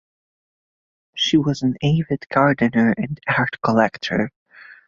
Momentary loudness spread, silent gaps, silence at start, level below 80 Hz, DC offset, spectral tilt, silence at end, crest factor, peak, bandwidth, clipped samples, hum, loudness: 6 LU; 4.36-4.46 s; 1.15 s; -52 dBFS; under 0.1%; -6 dB/octave; 0.15 s; 18 dB; -2 dBFS; 7.4 kHz; under 0.1%; none; -19 LUFS